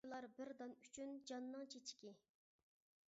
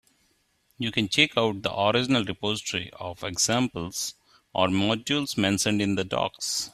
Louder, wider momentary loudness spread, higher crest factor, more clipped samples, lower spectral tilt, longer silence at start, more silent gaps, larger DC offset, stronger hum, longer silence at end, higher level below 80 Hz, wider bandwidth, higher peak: second, -54 LUFS vs -25 LUFS; second, 5 LU vs 10 LU; second, 16 dB vs 22 dB; neither; second, -2 dB/octave vs -3.5 dB/octave; second, 0.05 s vs 0.8 s; neither; neither; neither; first, 0.9 s vs 0.05 s; second, under -90 dBFS vs -60 dBFS; second, 7.6 kHz vs 15.5 kHz; second, -40 dBFS vs -4 dBFS